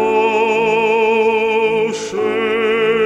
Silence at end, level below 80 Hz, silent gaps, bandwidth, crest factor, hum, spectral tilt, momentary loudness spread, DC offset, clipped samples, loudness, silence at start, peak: 0 s; -56 dBFS; none; 9.2 kHz; 12 dB; none; -4 dB/octave; 5 LU; under 0.1%; under 0.1%; -15 LUFS; 0 s; -4 dBFS